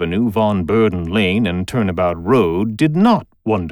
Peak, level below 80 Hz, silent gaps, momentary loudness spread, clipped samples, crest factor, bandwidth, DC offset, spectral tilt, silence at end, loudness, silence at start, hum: -2 dBFS; -42 dBFS; none; 5 LU; under 0.1%; 14 dB; 20 kHz; under 0.1%; -7.5 dB/octave; 0 s; -16 LUFS; 0 s; none